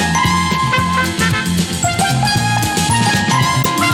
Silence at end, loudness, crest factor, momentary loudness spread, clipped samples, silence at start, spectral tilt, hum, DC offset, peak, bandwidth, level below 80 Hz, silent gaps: 0 s; -14 LUFS; 12 dB; 3 LU; under 0.1%; 0 s; -3.5 dB/octave; none; under 0.1%; -2 dBFS; 16.5 kHz; -36 dBFS; none